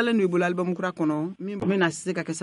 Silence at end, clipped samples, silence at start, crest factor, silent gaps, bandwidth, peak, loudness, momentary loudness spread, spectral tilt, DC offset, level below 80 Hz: 0 s; under 0.1%; 0 s; 16 dB; none; 11.5 kHz; -10 dBFS; -26 LUFS; 7 LU; -5.5 dB/octave; under 0.1%; -68 dBFS